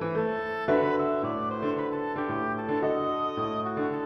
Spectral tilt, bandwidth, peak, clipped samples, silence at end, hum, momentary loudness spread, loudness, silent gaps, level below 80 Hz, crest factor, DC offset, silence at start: -8 dB/octave; 6.6 kHz; -10 dBFS; under 0.1%; 0 s; none; 5 LU; -28 LUFS; none; -62 dBFS; 18 dB; under 0.1%; 0 s